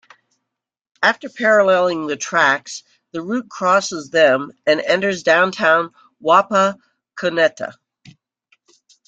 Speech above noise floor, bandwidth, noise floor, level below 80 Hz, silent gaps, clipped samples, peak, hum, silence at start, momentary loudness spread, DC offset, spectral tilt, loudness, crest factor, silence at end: 66 dB; 9 kHz; -82 dBFS; -68 dBFS; none; under 0.1%; -2 dBFS; none; 1 s; 16 LU; under 0.1%; -3.5 dB/octave; -17 LUFS; 18 dB; 1.35 s